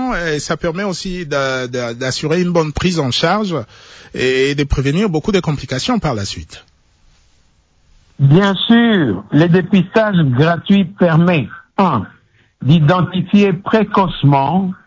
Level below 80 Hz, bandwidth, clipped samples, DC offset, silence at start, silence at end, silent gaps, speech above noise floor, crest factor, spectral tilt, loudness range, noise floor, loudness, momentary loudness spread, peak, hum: -36 dBFS; 8 kHz; under 0.1%; under 0.1%; 0 s; 0.15 s; none; 40 dB; 14 dB; -6.5 dB/octave; 5 LU; -54 dBFS; -15 LUFS; 10 LU; -2 dBFS; none